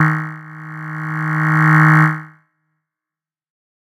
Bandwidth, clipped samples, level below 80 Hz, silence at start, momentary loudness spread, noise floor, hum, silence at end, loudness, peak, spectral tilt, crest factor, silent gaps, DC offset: 9 kHz; under 0.1%; -60 dBFS; 0 s; 20 LU; -89 dBFS; none; 1.55 s; -14 LUFS; 0 dBFS; -8 dB/octave; 16 dB; none; under 0.1%